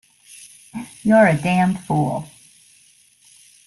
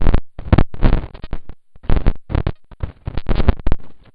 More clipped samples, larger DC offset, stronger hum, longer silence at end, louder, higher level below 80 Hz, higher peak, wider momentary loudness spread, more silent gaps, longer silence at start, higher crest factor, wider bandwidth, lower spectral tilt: neither; neither; neither; first, 1.4 s vs 0.2 s; first, -18 LUFS vs -22 LUFS; second, -56 dBFS vs -18 dBFS; second, -4 dBFS vs 0 dBFS; first, 26 LU vs 15 LU; neither; first, 0.75 s vs 0 s; about the same, 18 dB vs 14 dB; first, 12.5 kHz vs 4.8 kHz; second, -7 dB/octave vs -11 dB/octave